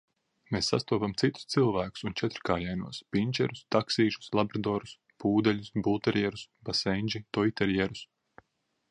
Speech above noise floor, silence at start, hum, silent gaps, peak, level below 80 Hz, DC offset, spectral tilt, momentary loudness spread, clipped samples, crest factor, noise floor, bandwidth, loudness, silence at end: 48 dB; 0.5 s; none; none; -10 dBFS; -56 dBFS; under 0.1%; -5.5 dB/octave; 7 LU; under 0.1%; 20 dB; -77 dBFS; 11 kHz; -30 LUFS; 0.85 s